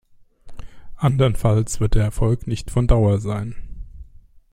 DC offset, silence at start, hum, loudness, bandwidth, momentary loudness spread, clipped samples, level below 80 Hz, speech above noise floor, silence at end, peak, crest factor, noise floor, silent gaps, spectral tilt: under 0.1%; 0.45 s; none; -20 LUFS; 13 kHz; 15 LU; under 0.1%; -28 dBFS; 28 dB; 0.5 s; -2 dBFS; 18 dB; -45 dBFS; none; -7 dB/octave